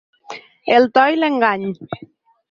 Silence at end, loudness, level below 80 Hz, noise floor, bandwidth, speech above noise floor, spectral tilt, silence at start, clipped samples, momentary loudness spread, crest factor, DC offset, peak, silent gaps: 0.55 s; -16 LUFS; -64 dBFS; -37 dBFS; 7.2 kHz; 22 dB; -6 dB/octave; 0.3 s; under 0.1%; 22 LU; 16 dB; under 0.1%; -2 dBFS; none